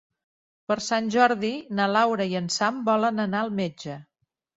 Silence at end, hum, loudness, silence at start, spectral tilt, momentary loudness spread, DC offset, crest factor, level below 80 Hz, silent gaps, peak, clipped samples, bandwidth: 0.55 s; none; -24 LUFS; 0.7 s; -4.5 dB/octave; 13 LU; under 0.1%; 20 dB; -68 dBFS; none; -4 dBFS; under 0.1%; 8 kHz